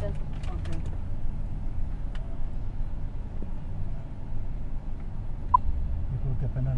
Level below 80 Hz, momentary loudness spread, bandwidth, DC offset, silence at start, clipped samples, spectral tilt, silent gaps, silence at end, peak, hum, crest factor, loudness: -30 dBFS; 12 LU; 3.8 kHz; under 0.1%; 0 s; under 0.1%; -8.5 dB/octave; none; 0 s; -6 dBFS; none; 22 dB; -34 LUFS